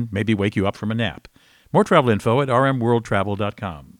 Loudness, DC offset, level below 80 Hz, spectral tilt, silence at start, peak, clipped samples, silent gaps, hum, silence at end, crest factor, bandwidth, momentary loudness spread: -20 LUFS; under 0.1%; -52 dBFS; -7 dB/octave; 0 s; -2 dBFS; under 0.1%; none; none; 0.15 s; 18 dB; 13.5 kHz; 9 LU